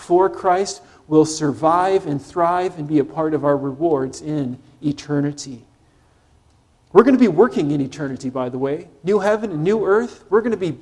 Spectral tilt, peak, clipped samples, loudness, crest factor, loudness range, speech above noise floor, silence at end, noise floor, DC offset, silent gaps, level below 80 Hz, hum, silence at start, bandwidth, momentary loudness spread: -6.5 dB/octave; 0 dBFS; under 0.1%; -19 LUFS; 18 dB; 5 LU; 38 dB; 0.05 s; -56 dBFS; under 0.1%; none; -56 dBFS; none; 0 s; 11.5 kHz; 11 LU